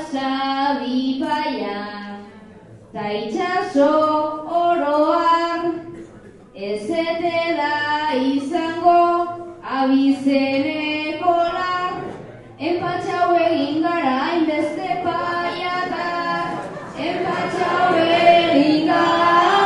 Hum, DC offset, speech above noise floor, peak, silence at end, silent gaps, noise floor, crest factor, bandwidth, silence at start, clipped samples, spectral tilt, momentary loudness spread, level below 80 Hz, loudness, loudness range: none; under 0.1%; 23 dB; -2 dBFS; 0 s; none; -43 dBFS; 18 dB; 11.5 kHz; 0 s; under 0.1%; -5.5 dB/octave; 13 LU; -58 dBFS; -19 LUFS; 4 LU